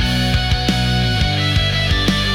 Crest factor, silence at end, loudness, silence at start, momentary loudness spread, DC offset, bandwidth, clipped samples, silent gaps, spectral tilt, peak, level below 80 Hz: 10 dB; 0 s; -16 LUFS; 0 s; 1 LU; under 0.1%; 17.5 kHz; under 0.1%; none; -5 dB/octave; -6 dBFS; -24 dBFS